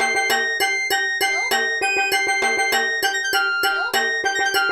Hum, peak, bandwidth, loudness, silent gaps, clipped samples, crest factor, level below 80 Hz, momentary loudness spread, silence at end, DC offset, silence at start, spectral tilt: none; -6 dBFS; over 20 kHz; -19 LUFS; none; under 0.1%; 14 dB; -60 dBFS; 2 LU; 0 s; under 0.1%; 0 s; 0.5 dB/octave